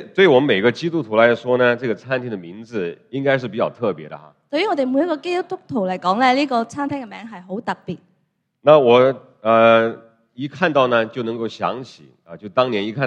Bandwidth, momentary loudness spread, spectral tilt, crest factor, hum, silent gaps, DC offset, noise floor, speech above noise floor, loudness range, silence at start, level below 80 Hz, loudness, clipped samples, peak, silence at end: 8.8 kHz; 17 LU; -6.5 dB/octave; 18 dB; none; none; under 0.1%; -68 dBFS; 50 dB; 6 LU; 0 s; -68 dBFS; -18 LUFS; under 0.1%; 0 dBFS; 0 s